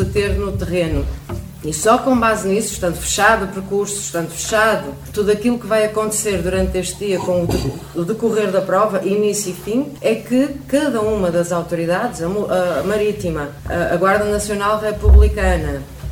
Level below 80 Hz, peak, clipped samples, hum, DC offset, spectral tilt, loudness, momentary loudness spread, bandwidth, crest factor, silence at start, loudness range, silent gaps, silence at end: -24 dBFS; 0 dBFS; under 0.1%; none; under 0.1%; -5 dB/octave; -18 LUFS; 8 LU; 17.5 kHz; 16 dB; 0 s; 2 LU; none; 0 s